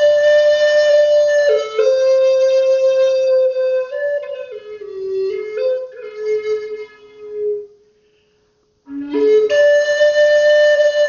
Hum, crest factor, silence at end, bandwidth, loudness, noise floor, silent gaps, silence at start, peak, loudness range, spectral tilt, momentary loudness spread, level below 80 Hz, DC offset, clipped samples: none; 12 dB; 0 s; 7.2 kHz; -14 LUFS; -60 dBFS; none; 0 s; -2 dBFS; 11 LU; 0 dB/octave; 17 LU; -62 dBFS; under 0.1%; under 0.1%